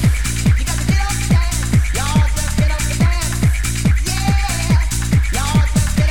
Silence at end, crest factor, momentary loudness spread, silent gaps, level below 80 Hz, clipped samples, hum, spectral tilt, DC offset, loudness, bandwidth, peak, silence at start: 0 s; 12 dB; 1 LU; none; -18 dBFS; under 0.1%; none; -4.5 dB/octave; 3%; -17 LUFS; 17.5 kHz; -4 dBFS; 0 s